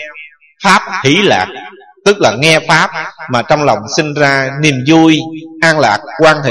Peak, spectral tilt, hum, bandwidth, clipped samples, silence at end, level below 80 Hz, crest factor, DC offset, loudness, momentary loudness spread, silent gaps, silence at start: 0 dBFS; -4.5 dB/octave; none; 12 kHz; 0.3%; 0 s; -48 dBFS; 12 dB; under 0.1%; -10 LUFS; 8 LU; none; 0 s